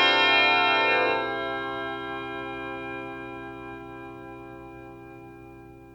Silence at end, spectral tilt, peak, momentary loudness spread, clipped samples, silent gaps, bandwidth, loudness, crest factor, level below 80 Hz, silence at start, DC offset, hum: 0 s; -4 dB/octave; -8 dBFS; 26 LU; under 0.1%; none; 19 kHz; -24 LUFS; 18 dB; -58 dBFS; 0 s; under 0.1%; none